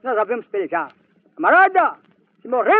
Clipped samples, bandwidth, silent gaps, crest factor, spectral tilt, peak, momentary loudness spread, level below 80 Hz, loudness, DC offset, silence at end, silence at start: under 0.1%; 4.5 kHz; none; 16 dB; -1.5 dB/octave; -4 dBFS; 12 LU; -84 dBFS; -18 LUFS; under 0.1%; 0 s; 0.05 s